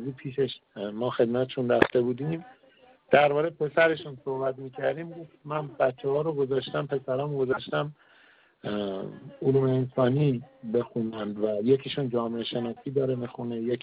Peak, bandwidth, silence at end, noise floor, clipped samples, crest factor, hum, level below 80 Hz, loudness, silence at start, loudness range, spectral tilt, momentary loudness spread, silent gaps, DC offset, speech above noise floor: -4 dBFS; 5 kHz; 0.05 s; -59 dBFS; under 0.1%; 24 dB; none; -66 dBFS; -28 LUFS; 0 s; 4 LU; -5.5 dB/octave; 11 LU; none; under 0.1%; 32 dB